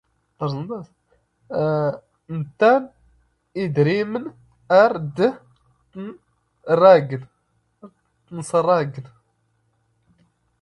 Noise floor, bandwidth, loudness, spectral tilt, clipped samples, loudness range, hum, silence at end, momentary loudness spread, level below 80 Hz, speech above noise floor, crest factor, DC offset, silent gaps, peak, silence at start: -67 dBFS; 11 kHz; -19 LUFS; -7 dB/octave; under 0.1%; 4 LU; none; 1.6 s; 22 LU; -62 dBFS; 48 dB; 22 dB; under 0.1%; none; 0 dBFS; 0.4 s